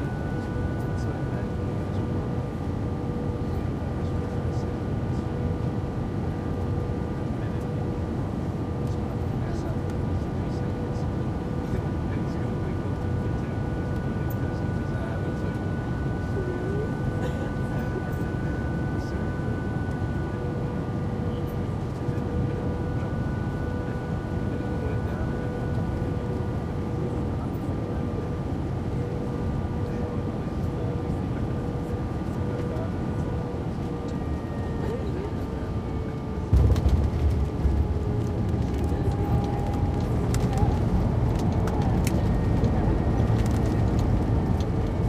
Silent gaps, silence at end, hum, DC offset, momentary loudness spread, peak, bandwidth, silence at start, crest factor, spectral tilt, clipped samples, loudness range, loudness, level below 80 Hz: none; 0 s; none; under 0.1%; 6 LU; -8 dBFS; 15 kHz; 0 s; 18 dB; -8.5 dB/octave; under 0.1%; 5 LU; -28 LUFS; -34 dBFS